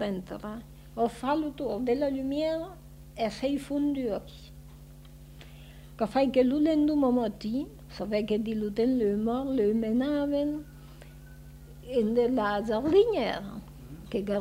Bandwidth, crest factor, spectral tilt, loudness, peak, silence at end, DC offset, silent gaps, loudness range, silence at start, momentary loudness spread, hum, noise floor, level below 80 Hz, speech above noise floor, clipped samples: 16 kHz; 18 dB; -7 dB/octave; -28 LUFS; -12 dBFS; 0 s; under 0.1%; none; 5 LU; 0 s; 24 LU; 50 Hz at -80 dBFS; -48 dBFS; -52 dBFS; 21 dB; under 0.1%